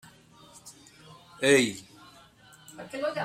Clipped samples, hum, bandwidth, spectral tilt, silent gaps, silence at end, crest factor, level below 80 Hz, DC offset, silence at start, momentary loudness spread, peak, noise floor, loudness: under 0.1%; none; 16 kHz; -3.5 dB/octave; none; 0 s; 22 dB; -70 dBFS; under 0.1%; 0.65 s; 27 LU; -8 dBFS; -55 dBFS; -26 LUFS